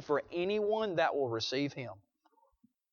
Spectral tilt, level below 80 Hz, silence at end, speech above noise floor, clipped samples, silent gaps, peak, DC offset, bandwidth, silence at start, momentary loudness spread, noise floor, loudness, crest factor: -5 dB/octave; -74 dBFS; 0.95 s; 38 dB; under 0.1%; none; -18 dBFS; under 0.1%; 7 kHz; 0 s; 8 LU; -72 dBFS; -33 LUFS; 18 dB